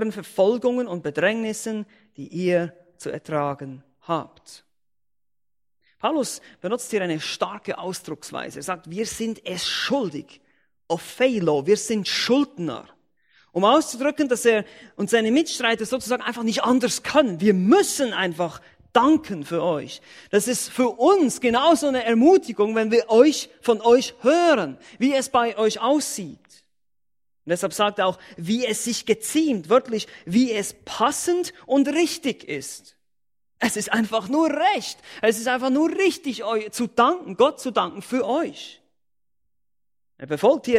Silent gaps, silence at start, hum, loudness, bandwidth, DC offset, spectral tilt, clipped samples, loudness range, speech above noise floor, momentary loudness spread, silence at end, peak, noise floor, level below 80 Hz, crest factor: none; 0 s; none; -22 LUFS; 16 kHz; under 0.1%; -4 dB/octave; under 0.1%; 9 LU; 67 dB; 13 LU; 0 s; -2 dBFS; -89 dBFS; -64 dBFS; 20 dB